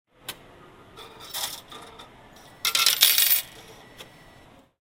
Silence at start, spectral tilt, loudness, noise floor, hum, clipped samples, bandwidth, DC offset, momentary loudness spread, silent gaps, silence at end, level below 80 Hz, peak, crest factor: 0.3 s; 2 dB/octave; -20 LUFS; -53 dBFS; none; under 0.1%; 16.5 kHz; under 0.1%; 26 LU; none; 0.75 s; -62 dBFS; 0 dBFS; 28 dB